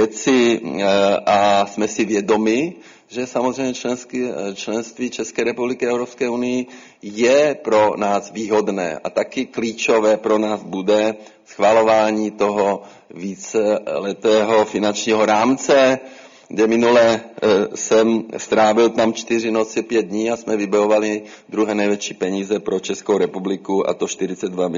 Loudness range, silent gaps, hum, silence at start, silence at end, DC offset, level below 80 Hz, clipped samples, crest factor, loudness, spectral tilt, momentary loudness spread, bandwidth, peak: 5 LU; none; none; 0 s; 0 s; under 0.1%; -62 dBFS; under 0.1%; 16 dB; -18 LUFS; -4 dB/octave; 10 LU; 7.6 kHz; -2 dBFS